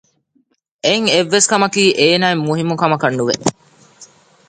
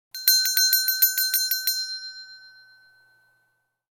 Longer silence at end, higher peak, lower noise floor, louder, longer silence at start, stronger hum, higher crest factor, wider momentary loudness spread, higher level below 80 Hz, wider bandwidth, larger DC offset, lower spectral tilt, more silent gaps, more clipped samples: second, 0.45 s vs 1.45 s; first, 0 dBFS vs -4 dBFS; second, -61 dBFS vs -72 dBFS; first, -14 LUFS vs -19 LUFS; first, 0.85 s vs 0.15 s; neither; second, 16 dB vs 22 dB; second, 6 LU vs 16 LU; first, -60 dBFS vs under -90 dBFS; second, 9.6 kHz vs 19 kHz; neither; first, -3.5 dB/octave vs 7.5 dB/octave; neither; neither